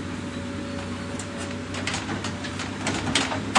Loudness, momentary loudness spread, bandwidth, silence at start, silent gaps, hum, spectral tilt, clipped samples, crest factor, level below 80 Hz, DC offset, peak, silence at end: -29 LUFS; 8 LU; 11.5 kHz; 0 s; none; none; -3.5 dB/octave; under 0.1%; 24 dB; -50 dBFS; under 0.1%; -4 dBFS; 0 s